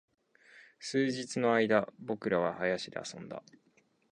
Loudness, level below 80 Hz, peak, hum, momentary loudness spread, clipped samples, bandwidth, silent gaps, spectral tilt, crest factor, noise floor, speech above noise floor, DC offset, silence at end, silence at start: -32 LUFS; -74 dBFS; -12 dBFS; none; 17 LU; under 0.1%; 10.5 kHz; none; -5 dB/octave; 22 dB; -60 dBFS; 28 dB; under 0.1%; 0.75 s; 0.55 s